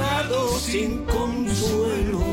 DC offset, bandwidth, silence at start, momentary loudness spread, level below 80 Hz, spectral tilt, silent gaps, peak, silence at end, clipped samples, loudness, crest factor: under 0.1%; 16.5 kHz; 0 s; 2 LU; -32 dBFS; -5 dB/octave; none; -10 dBFS; 0 s; under 0.1%; -23 LUFS; 12 dB